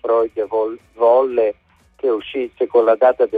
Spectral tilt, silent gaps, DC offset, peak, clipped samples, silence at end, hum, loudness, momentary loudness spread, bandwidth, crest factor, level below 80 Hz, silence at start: -6.5 dB/octave; none; under 0.1%; -4 dBFS; under 0.1%; 0 s; none; -18 LUFS; 9 LU; 4.7 kHz; 14 dB; -58 dBFS; 0.05 s